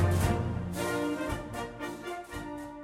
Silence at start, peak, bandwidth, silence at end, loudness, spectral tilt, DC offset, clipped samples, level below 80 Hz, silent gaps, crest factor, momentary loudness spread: 0 s; -14 dBFS; 16 kHz; 0 s; -34 LUFS; -6 dB/octave; under 0.1%; under 0.1%; -46 dBFS; none; 18 dB; 11 LU